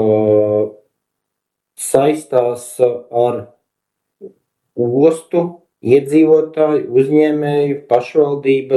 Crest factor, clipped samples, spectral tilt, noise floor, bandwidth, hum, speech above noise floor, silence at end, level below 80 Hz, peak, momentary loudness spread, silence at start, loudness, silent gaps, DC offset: 16 dB; under 0.1%; -6.5 dB/octave; -78 dBFS; 12.5 kHz; none; 65 dB; 0 s; -62 dBFS; 0 dBFS; 9 LU; 0 s; -15 LUFS; none; under 0.1%